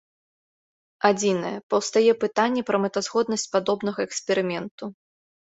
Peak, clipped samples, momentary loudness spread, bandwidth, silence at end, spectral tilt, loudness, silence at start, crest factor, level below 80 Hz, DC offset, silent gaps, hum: -4 dBFS; under 0.1%; 9 LU; 8.2 kHz; 0.65 s; -4 dB/octave; -24 LUFS; 1.05 s; 20 dB; -68 dBFS; under 0.1%; 1.63-1.70 s, 4.71-4.78 s; none